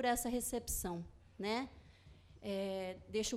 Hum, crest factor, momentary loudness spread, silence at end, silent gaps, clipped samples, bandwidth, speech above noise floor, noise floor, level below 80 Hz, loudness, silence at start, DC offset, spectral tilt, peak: none; 18 dB; 13 LU; 0 s; none; under 0.1%; 16 kHz; 22 dB; -61 dBFS; -56 dBFS; -41 LUFS; 0 s; under 0.1%; -3.5 dB/octave; -22 dBFS